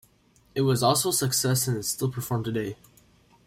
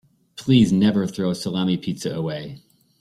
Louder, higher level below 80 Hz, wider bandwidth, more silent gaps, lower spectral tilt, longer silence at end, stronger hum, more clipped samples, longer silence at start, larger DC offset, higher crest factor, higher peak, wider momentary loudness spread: second, -25 LUFS vs -21 LUFS; second, -60 dBFS vs -52 dBFS; first, 16.5 kHz vs 13.5 kHz; neither; second, -4 dB/octave vs -6.5 dB/octave; first, 0.75 s vs 0.4 s; neither; neither; first, 0.55 s vs 0.35 s; neither; about the same, 18 dB vs 18 dB; second, -8 dBFS vs -4 dBFS; second, 12 LU vs 16 LU